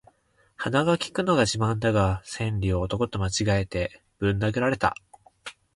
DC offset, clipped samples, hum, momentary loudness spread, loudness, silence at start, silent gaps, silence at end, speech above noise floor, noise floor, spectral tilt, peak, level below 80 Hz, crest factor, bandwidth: under 0.1%; under 0.1%; none; 11 LU; -25 LUFS; 0.6 s; none; 0.25 s; 39 dB; -63 dBFS; -5.5 dB/octave; -8 dBFS; -42 dBFS; 18 dB; 11.5 kHz